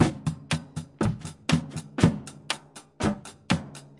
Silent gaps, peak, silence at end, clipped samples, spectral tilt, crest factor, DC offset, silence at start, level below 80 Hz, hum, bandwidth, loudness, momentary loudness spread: none; -4 dBFS; 0.2 s; under 0.1%; -5.5 dB/octave; 24 dB; under 0.1%; 0 s; -50 dBFS; none; 11.5 kHz; -29 LUFS; 13 LU